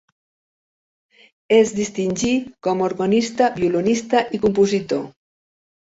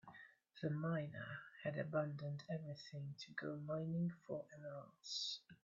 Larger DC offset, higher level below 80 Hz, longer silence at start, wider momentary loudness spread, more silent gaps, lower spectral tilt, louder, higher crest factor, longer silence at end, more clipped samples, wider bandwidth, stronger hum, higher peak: neither; first, -54 dBFS vs -84 dBFS; first, 1.5 s vs 0.05 s; second, 7 LU vs 11 LU; neither; about the same, -5 dB/octave vs -5 dB/octave; first, -19 LUFS vs -46 LUFS; about the same, 18 dB vs 18 dB; first, 0.85 s vs 0.1 s; neither; about the same, 8 kHz vs 7.6 kHz; neither; first, -2 dBFS vs -28 dBFS